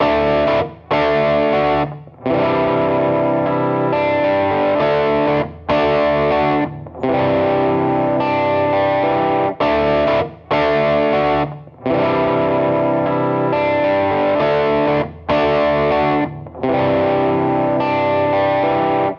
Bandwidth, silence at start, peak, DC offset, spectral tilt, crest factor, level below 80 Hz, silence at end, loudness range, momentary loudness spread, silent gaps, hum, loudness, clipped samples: 6.6 kHz; 0 s; -4 dBFS; under 0.1%; -8 dB/octave; 12 dB; -44 dBFS; 0 s; 1 LU; 5 LU; none; none; -17 LUFS; under 0.1%